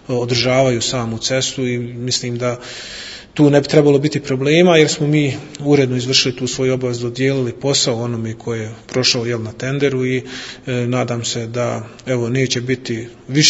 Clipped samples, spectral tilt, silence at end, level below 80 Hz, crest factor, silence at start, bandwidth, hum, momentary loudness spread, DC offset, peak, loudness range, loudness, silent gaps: under 0.1%; -4.5 dB/octave; 0 s; -50 dBFS; 16 dB; 0.1 s; 8 kHz; none; 12 LU; under 0.1%; 0 dBFS; 6 LU; -17 LUFS; none